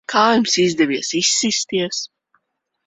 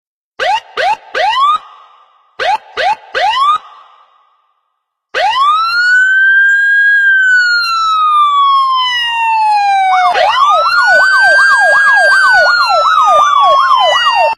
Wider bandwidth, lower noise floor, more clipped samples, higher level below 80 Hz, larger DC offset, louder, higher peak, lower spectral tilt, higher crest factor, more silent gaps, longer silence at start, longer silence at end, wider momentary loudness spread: second, 8.4 kHz vs 14 kHz; about the same, -72 dBFS vs -69 dBFS; neither; second, -62 dBFS vs -54 dBFS; neither; second, -17 LUFS vs -8 LUFS; about the same, -2 dBFS vs 0 dBFS; first, -2.5 dB/octave vs 1 dB/octave; first, 18 dB vs 10 dB; neither; second, 0.1 s vs 0.4 s; first, 0.8 s vs 0.05 s; about the same, 9 LU vs 9 LU